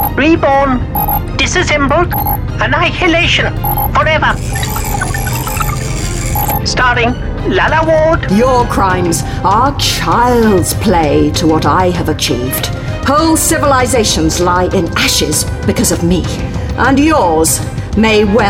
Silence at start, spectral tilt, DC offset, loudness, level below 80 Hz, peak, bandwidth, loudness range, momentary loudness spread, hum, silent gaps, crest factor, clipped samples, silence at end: 0 s; -4.5 dB/octave; under 0.1%; -11 LUFS; -22 dBFS; 0 dBFS; 17 kHz; 3 LU; 7 LU; none; none; 10 dB; under 0.1%; 0 s